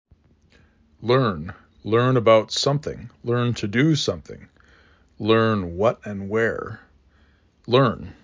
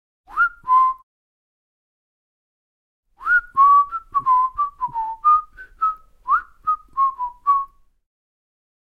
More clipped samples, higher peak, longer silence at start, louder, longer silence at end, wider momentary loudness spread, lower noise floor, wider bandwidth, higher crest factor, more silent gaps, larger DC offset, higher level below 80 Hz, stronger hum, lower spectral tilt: neither; about the same, -4 dBFS vs -6 dBFS; first, 1 s vs 0.3 s; about the same, -21 LUFS vs -19 LUFS; second, 0.1 s vs 1.3 s; first, 16 LU vs 12 LU; second, -58 dBFS vs under -90 dBFS; first, 7.6 kHz vs 4.8 kHz; about the same, 20 dB vs 16 dB; second, none vs 1.03-3.03 s; neither; about the same, -50 dBFS vs -54 dBFS; neither; first, -6 dB/octave vs -3 dB/octave